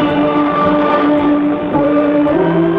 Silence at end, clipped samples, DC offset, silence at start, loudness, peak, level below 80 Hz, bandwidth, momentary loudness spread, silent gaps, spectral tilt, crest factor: 0 s; under 0.1%; under 0.1%; 0 s; -13 LUFS; -2 dBFS; -42 dBFS; 5 kHz; 2 LU; none; -9 dB/octave; 10 dB